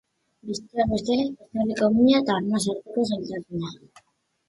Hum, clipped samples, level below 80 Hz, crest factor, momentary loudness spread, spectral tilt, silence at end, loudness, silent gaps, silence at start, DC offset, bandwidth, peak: none; under 0.1%; -52 dBFS; 18 dB; 15 LU; -5.5 dB/octave; 0.75 s; -24 LUFS; none; 0.45 s; under 0.1%; 11.5 kHz; -8 dBFS